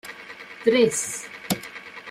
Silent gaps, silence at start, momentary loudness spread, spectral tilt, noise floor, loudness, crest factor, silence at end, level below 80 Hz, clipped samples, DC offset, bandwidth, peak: none; 0.05 s; 19 LU; -3 dB/octave; -41 dBFS; -24 LUFS; 20 dB; 0 s; -66 dBFS; under 0.1%; under 0.1%; 16 kHz; -6 dBFS